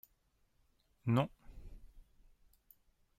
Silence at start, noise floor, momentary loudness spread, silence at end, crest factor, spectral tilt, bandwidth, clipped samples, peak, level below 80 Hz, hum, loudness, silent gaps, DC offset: 1.05 s; -76 dBFS; 26 LU; 1.2 s; 24 dB; -8.5 dB/octave; 15 kHz; under 0.1%; -20 dBFS; -60 dBFS; none; -37 LUFS; none; under 0.1%